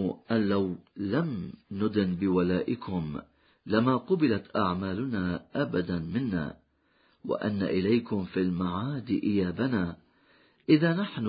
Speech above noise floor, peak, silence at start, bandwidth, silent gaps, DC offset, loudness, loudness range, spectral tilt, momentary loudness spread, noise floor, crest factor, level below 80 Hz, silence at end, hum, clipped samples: 39 dB; -10 dBFS; 0 s; 5.2 kHz; none; under 0.1%; -29 LUFS; 2 LU; -11.5 dB/octave; 8 LU; -67 dBFS; 20 dB; -54 dBFS; 0 s; none; under 0.1%